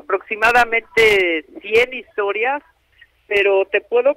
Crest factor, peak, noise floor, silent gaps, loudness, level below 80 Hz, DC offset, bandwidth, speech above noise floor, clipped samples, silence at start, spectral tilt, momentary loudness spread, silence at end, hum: 14 dB; -2 dBFS; -53 dBFS; none; -17 LUFS; -50 dBFS; under 0.1%; 16 kHz; 36 dB; under 0.1%; 0.1 s; -3 dB/octave; 9 LU; 0.05 s; none